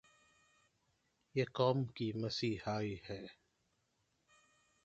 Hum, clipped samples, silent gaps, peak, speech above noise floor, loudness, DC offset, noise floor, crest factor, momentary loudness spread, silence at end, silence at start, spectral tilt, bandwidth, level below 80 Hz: none; under 0.1%; none; -20 dBFS; 43 dB; -39 LUFS; under 0.1%; -81 dBFS; 22 dB; 14 LU; 1.5 s; 1.35 s; -6.5 dB/octave; 7.8 kHz; -70 dBFS